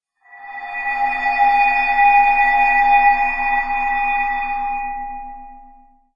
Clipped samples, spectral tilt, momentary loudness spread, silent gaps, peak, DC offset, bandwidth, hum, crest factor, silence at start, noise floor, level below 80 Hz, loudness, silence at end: under 0.1%; -3.5 dB/octave; 16 LU; none; -2 dBFS; under 0.1%; 7.2 kHz; none; 16 dB; 0.35 s; -47 dBFS; -40 dBFS; -16 LUFS; 0.55 s